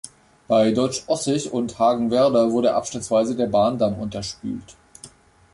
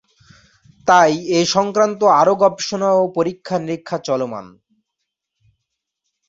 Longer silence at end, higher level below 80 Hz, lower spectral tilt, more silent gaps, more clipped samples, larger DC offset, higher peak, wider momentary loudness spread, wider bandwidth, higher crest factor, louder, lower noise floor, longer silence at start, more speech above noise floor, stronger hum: second, 0.45 s vs 1.8 s; first, -54 dBFS vs -62 dBFS; about the same, -5.5 dB/octave vs -4.5 dB/octave; neither; neither; neither; second, -6 dBFS vs 0 dBFS; about the same, 12 LU vs 12 LU; first, 11.5 kHz vs 7.8 kHz; about the same, 16 dB vs 18 dB; second, -21 LUFS vs -17 LUFS; second, -47 dBFS vs -78 dBFS; second, 0.05 s vs 0.85 s; second, 27 dB vs 62 dB; neither